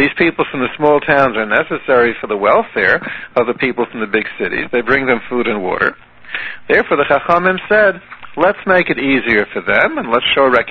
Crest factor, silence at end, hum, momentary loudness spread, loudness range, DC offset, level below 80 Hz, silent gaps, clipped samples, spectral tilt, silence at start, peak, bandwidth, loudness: 14 dB; 0 s; none; 6 LU; 3 LU; under 0.1%; -46 dBFS; none; under 0.1%; -7 dB/octave; 0 s; 0 dBFS; 6.2 kHz; -14 LUFS